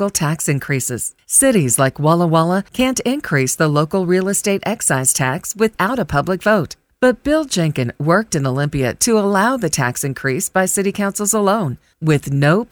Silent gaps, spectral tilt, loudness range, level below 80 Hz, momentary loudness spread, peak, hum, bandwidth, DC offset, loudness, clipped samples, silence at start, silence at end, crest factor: none; -4.5 dB/octave; 2 LU; -46 dBFS; 6 LU; -2 dBFS; none; over 20 kHz; under 0.1%; -16 LUFS; under 0.1%; 0 s; 0.1 s; 14 dB